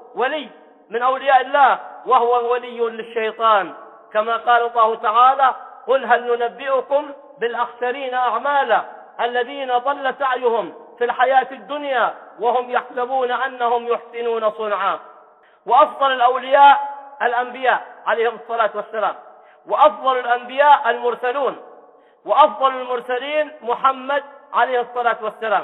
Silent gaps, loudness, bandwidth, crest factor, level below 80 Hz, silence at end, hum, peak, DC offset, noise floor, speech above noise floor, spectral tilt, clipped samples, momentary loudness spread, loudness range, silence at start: none; -18 LUFS; 4.1 kHz; 18 dB; -76 dBFS; 0 s; none; 0 dBFS; under 0.1%; -49 dBFS; 31 dB; -5 dB/octave; under 0.1%; 10 LU; 4 LU; 0.15 s